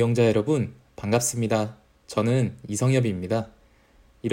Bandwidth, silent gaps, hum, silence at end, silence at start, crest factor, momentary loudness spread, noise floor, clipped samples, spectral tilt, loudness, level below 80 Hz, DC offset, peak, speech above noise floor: 16 kHz; none; none; 0 s; 0 s; 16 dB; 12 LU; -57 dBFS; under 0.1%; -6 dB/octave; -25 LUFS; -58 dBFS; under 0.1%; -8 dBFS; 34 dB